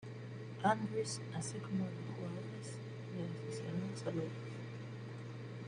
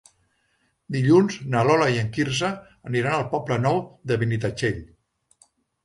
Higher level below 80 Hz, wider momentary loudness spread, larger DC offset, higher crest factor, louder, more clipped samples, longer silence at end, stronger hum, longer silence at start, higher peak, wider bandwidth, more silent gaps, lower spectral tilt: second, -76 dBFS vs -54 dBFS; about the same, 11 LU vs 10 LU; neither; first, 24 dB vs 18 dB; second, -42 LUFS vs -23 LUFS; neither; second, 0 s vs 1 s; neither; second, 0 s vs 0.9 s; second, -18 dBFS vs -6 dBFS; about the same, 11 kHz vs 11.5 kHz; neither; about the same, -5.5 dB/octave vs -6 dB/octave